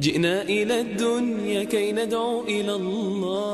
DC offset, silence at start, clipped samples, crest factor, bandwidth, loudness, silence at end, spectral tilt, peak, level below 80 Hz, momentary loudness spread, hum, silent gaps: under 0.1%; 0 s; under 0.1%; 16 dB; 13.5 kHz; -24 LUFS; 0 s; -5 dB/octave; -8 dBFS; -60 dBFS; 4 LU; none; none